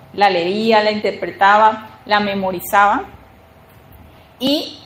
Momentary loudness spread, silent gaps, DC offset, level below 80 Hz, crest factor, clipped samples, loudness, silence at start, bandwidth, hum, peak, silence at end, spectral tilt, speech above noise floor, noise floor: 10 LU; none; under 0.1%; -52 dBFS; 18 dB; under 0.1%; -15 LUFS; 0.15 s; 16.5 kHz; none; 0 dBFS; 0.05 s; -4.5 dB/octave; 30 dB; -45 dBFS